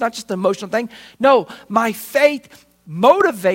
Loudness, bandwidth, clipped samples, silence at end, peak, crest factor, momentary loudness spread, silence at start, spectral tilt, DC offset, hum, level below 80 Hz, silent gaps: -17 LUFS; 16.5 kHz; under 0.1%; 0 s; 0 dBFS; 18 dB; 10 LU; 0 s; -4.5 dB/octave; under 0.1%; none; -64 dBFS; none